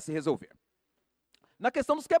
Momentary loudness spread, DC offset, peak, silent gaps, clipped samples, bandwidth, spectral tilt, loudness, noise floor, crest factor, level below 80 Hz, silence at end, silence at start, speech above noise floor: 6 LU; under 0.1%; -12 dBFS; none; under 0.1%; 13.5 kHz; -5.5 dB/octave; -31 LUFS; -80 dBFS; 20 dB; -66 dBFS; 0 s; 0 s; 51 dB